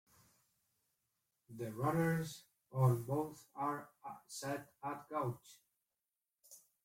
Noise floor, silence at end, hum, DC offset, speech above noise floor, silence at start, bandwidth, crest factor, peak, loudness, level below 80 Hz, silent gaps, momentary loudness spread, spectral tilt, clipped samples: under -90 dBFS; 0.25 s; none; under 0.1%; over 51 dB; 1.5 s; 16.5 kHz; 22 dB; -20 dBFS; -40 LUFS; -74 dBFS; none; 20 LU; -6.5 dB/octave; under 0.1%